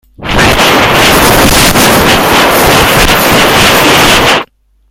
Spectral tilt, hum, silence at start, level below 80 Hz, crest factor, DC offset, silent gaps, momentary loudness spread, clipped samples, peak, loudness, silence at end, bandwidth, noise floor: -3 dB/octave; none; 0.2 s; -20 dBFS; 6 dB; under 0.1%; none; 3 LU; 1%; 0 dBFS; -4 LUFS; 0.45 s; over 20 kHz; -27 dBFS